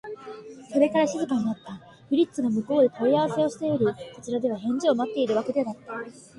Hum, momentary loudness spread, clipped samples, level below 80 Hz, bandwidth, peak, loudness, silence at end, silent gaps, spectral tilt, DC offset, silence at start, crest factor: none; 16 LU; under 0.1%; -66 dBFS; 11.5 kHz; -8 dBFS; -25 LUFS; 0.15 s; none; -6 dB/octave; under 0.1%; 0.05 s; 16 dB